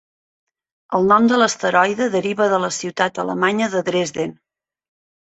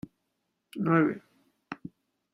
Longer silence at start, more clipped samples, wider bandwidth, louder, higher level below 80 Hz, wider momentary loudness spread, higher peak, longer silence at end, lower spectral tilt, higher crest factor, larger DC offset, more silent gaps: first, 0.9 s vs 0.75 s; neither; second, 8.2 kHz vs 12 kHz; first, -18 LUFS vs -27 LUFS; first, -62 dBFS vs -72 dBFS; second, 9 LU vs 23 LU; first, -2 dBFS vs -10 dBFS; first, 1.05 s vs 0.6 s; second, -4 dB/octave vs -9 dB/octave; about the same, 18 dB vs 22 dB; neither; neither